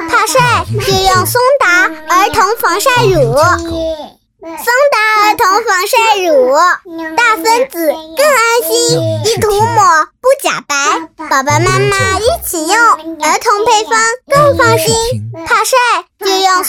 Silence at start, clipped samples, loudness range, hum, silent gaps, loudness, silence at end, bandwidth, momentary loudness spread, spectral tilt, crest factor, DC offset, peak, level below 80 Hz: 0 s; under 0.1%; 1 LU; none; none; -10 LUFS; 0 s; 18.5 kHz; 6 LU; -3 dB/octave; 10 dB; under 0.1%; 0 dBFS; -36 dBFS